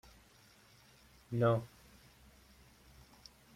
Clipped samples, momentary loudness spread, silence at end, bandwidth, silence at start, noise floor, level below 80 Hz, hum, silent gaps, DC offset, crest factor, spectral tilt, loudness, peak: under 0.1%; 29 LU; 1.9 s; 15.5 kHz; 1.3 s; -64 dBFS; -68 dBFS; none; none; under 0.1%; 22 dB; -7.5 dB/octave; -34 LUFS; -18 dBFS